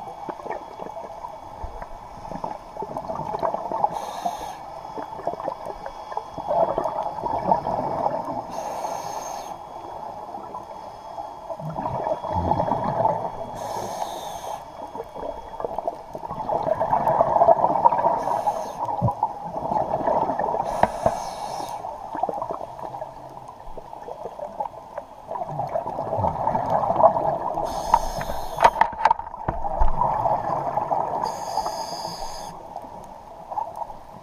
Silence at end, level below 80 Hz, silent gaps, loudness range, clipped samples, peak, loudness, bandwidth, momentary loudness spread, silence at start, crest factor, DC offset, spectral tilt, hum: 0 s; -40 dBFS; none; 11 LU; under 0.1%; 0 dBFS; -26 LUFS; 15 kHz; 16 LU; 0 s; 26 dB; under 0.1%; -5.5 dB/octave; none